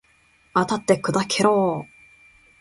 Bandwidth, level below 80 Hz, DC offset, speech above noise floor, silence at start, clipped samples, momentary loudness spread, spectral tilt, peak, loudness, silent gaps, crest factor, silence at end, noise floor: 11.5 kHz; -60 dBFS; under 0.1%; 39 dB; 0.55 s; under 0.1%; 9 LU; -4.5 dB/octave; -4 dBFS; -21 LUFS; none; 20 dB; 0.75 s; -59 dBFS